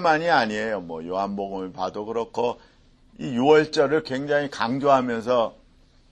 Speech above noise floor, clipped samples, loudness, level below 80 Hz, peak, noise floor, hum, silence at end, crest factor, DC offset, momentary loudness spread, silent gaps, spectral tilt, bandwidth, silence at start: 33 dB; under 0.1%; -23 LUFS; -58 dBFS; -4 dBFS; -56 dBFS; none; 0.6 s; 20 dB; under 0.1%; 12 LU; none; -5.5 dB/octave; 9.2 kHz; 0 s